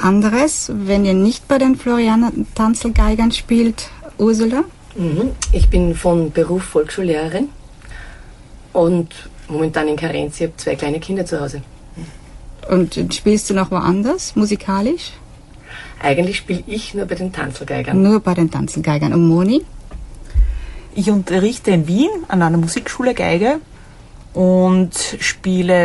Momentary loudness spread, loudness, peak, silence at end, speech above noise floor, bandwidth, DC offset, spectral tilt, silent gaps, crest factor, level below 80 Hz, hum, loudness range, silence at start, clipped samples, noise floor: 14 LU; -17 LUFS; -2 dBFS; 0 s; 23 dB; 11.5 kHz; under 0.1%; -6 dB/octave; none; 16 dB; -26 dBFS; none; 5 LU; 0 s; under 0.1%; -39 dBFS